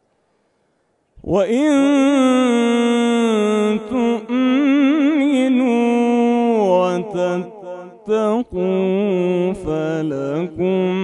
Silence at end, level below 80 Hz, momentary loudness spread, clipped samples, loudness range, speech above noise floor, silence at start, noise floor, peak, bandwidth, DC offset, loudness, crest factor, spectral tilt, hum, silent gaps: 0 s; -50 dBFS; 7 LU; under 0.1%; 4 LU; 49 dB; 1.25 s; -64 dBFS; -4 dBFS; 11 kHz; under 0.1%; -17 LUFS; 12 dB; -6 dB/octave; none; none